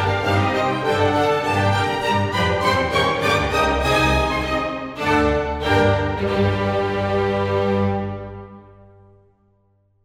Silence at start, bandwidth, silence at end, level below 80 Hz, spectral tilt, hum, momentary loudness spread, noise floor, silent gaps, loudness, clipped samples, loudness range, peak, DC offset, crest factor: 0 s; 16 kHz; 1.45 s; -36 dBFS; -5.5 dB/octave; none; 5 LU; -61 dBFS; none; -19 LUFS; under 0.1%; 4 LU; -4 dBFS; under 0.1%; 16 dB